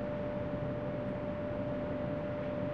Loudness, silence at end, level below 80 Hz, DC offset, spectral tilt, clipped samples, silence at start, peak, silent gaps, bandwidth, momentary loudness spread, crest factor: -37 LUFS; 0 s; -54 dBFS; 0.1%; -9.5 dB/octave; under 0.1%; 0 s; -26 dBFS; none; 6.4 kHz; 1 LU; 12 dB